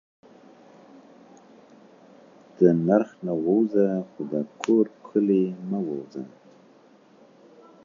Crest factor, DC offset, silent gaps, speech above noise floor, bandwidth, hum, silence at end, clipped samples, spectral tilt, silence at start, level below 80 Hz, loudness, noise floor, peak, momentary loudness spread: 22 dB; under 0.1%; none; 32 dB; 7.4 kHz; none; 1.55 s; under 0.1%; -8.5 dB/octave; 2.6 s; -72 dBFS; -24 LUFS; -55 dBFS; -4 dBFS; 11 LU